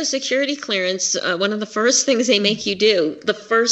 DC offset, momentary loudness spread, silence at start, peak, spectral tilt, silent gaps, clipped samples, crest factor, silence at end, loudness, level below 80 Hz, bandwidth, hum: under 0.1%; 5 LU; 0 s; -2 dBFS; -2 dB/octave; none; under 0.1%; 16 dB; 0 s; -18 LUFS; -66 dBFS; 8.4 kHz; none